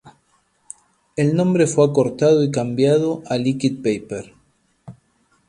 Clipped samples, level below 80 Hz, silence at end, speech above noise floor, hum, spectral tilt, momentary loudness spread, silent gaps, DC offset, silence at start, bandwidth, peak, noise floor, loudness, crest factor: under 0.1%; -60 dBFS; 0.55 s; 45 dB; none; -6.5 dB/octave; 19 LU; none; under 0.1%; 0.05 s; 11.5 kHz; -2 dBFS; -63 dBFS; -18 LUFS; 18 dB